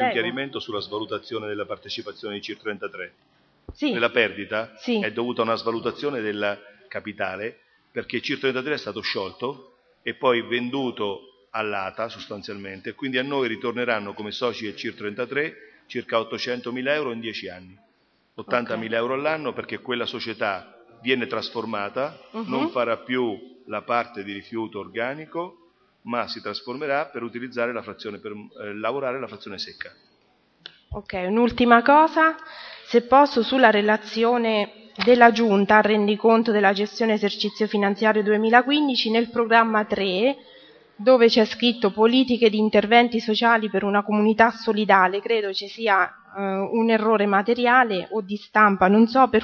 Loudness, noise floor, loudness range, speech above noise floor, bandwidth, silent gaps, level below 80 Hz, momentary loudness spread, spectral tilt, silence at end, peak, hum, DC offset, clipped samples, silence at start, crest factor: -22 LUFS; -65 dBFS; 11 LU; 43 dB; 6.8 kHz; none; -60 dBFS; 17 LU; -6 dB/octave; 0 s; 0 dBFS; none; under 0.1%; under 0.1%; 0 s; 22 dB